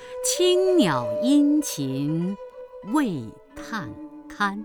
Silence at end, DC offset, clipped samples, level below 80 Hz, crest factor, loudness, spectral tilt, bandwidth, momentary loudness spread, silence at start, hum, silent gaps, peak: 0 s; under 0.1%; under 0.1%; -58 dBFS; 16 dB; -23 LUFS; -4.5 dB/octave; over 20 kHz; 21 LU; 0 s; none; none; -8 dBFS